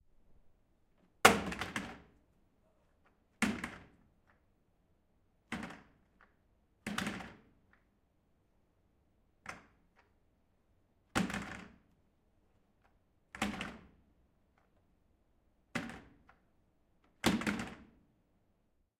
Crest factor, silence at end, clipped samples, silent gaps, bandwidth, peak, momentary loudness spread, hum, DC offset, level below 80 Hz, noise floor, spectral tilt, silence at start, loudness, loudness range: 40 dB; 1.15 s; under 0.1%; none; 16 kHz; -2 dBFS; 25 LU; none; under 0.1%; -64 dBFS; -76 dBFS; -3.5 dB/octave; 0.3 s; -36 LUFS; 16 LU